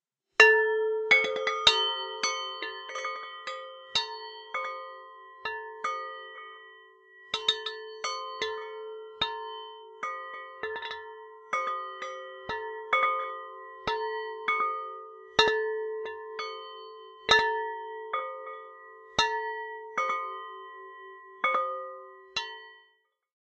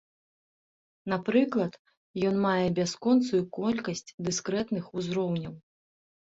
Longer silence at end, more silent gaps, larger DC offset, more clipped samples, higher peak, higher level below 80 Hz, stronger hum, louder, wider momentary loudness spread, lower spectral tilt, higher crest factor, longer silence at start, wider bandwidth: about the same, 0.7 s vs 0.7 s; second, none vs 1.79-1.85 s, 1.97-2.14 s, 4.14-4.18 s; neither; neither; first, -2 dBFS vs -12 dBFS; about the same, -66 dBFS vs -66 dBFS; neither; about the same, -29 LUFS vs -29 LUFS; first, 21 LU vs 10 LU; second, -0.5 dB/octave vs -5.5 dB/octave; first, 28 dB vs 18 dB; second, 0.4 s vs 1.05 s; first, 9.2 kHz vs 8 kHz